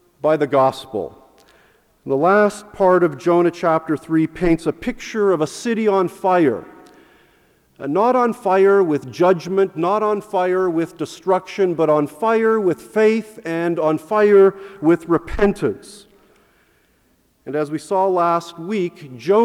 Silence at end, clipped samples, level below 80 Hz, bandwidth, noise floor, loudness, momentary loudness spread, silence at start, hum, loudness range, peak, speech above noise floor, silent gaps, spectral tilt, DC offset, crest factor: 0 s; under 0.1%; -44 dBFS; 13.5 kHz; -60 dBFS; -18 LUFS; 10 LU; 0.25 s; none; 6 LU; -2 dBFS; 43 dB; none; -6.5 dB/octave; under 0.1%; 16 dB